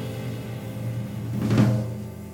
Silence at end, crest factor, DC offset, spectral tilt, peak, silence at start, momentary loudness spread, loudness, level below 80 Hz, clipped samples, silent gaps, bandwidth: 0 s; 18 dB; under 0.1%; -7.5 dB/octave; -8 dBFS; 0 s; 12 LU; -27 LUFS; -52 dBFS; under 0.1%; none; 17 kHz